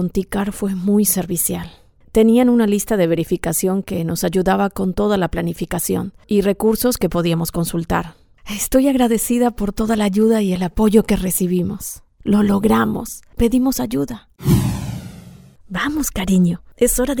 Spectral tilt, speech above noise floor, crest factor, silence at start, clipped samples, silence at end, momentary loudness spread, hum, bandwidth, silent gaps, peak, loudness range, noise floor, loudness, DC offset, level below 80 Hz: -5.5 dB/octave; 24 dB; 18 dB; 0 s; under 0.1%; 0 s; 9 LU; none; 19.5 kHz; none; 0 dBFS; 3 LU; -42 dBFS; -18 LUFS; under 0.1%; -36 dBFS